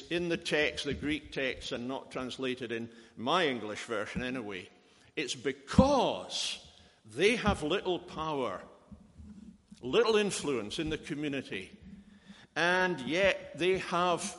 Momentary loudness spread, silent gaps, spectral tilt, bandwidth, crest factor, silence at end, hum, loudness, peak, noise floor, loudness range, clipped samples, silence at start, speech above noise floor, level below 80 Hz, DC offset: 14 LU; none; -4.5 dB/octave; 11.5 kHz; 24 dB; 0 s; none; -32 LUFS; -8 dBFS; -56 dBFS; 4 LU; under 0.1%; 0 s; 24 dB; -52 dBFS; under 0.1%